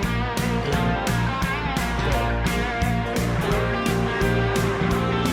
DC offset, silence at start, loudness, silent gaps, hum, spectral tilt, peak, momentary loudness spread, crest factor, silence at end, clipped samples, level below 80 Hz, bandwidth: under 0.1%; 0 s; -23 LUFS; none; none; -5.5 dB/octave; -10 dBFS; 2 LU; 12 dB; 0 s; under 0.1%; -30 dBFS; 17 kHz